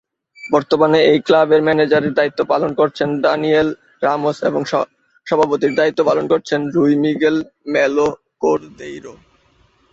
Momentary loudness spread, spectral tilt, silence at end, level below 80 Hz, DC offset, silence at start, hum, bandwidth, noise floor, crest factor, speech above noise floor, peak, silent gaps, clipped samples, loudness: 9 LU; -6 dB/octave; 0.8 s; -56 dBFS; under 0.1%; 0.4 s; none; 7.6 kHz; -56 dBFS; 16 dB; 40 dB; 0 dBFS; none; under 0.1%; -16 LUFS